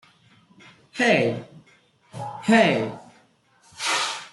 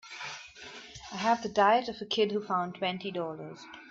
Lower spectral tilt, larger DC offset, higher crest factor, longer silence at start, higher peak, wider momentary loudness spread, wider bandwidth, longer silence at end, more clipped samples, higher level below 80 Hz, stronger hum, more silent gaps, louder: about the same, -4 dB/octave vs -4.5 dB/octave; neither; about the same, 22 dB vs 20 dB; first, 0.95 s vs 0.05 s; first, -4 dBFS vs -12 dBFS; about the same, 21 LU vs 20 LU; first, 12 kHz vs 7.8 kHz; about the same, 0.05 s vs 0 s; neither; about the same, -68 dBFS vs -68 dBFS; neither; neither; first, -22 LUFS vs -30 LUFS